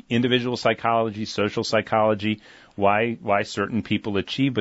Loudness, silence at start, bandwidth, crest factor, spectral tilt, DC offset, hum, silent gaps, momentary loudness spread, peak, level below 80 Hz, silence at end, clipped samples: -23 LUFS; 0.1 s; 8 kHz; 16 dB; -5.5 dB/octave; under 0.1%; none; none; 6 LU; -6 dBFS; -58 dBFS; 0 s; under 0.1%